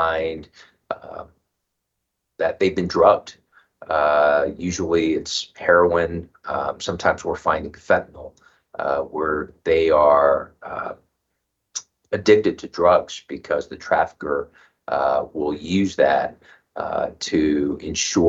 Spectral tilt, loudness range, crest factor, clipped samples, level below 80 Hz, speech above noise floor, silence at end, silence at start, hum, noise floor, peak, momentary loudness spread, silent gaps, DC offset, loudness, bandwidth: -4.5 dB/octave; 3 LU; 20 dB; under 0.1%; -50 dBFS; 58 dB; 0 s; 0 s; none; -78 dBFS; -2 dBFS; 17 LU; none; under 0.1%; -21 LUFS; 8 kHz